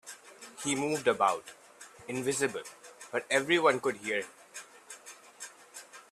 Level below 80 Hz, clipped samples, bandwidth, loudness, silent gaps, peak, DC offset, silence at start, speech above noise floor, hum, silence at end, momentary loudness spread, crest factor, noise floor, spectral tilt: -76 dBFS; under 0.1%; 13 kHz; -30 LUFS; none; -10 dBFS; under 0.1%; 0.05 s; 21 dB; none; 0.1 s; 22 LU; 24 dB; -51 dBFS; -3 dB/octave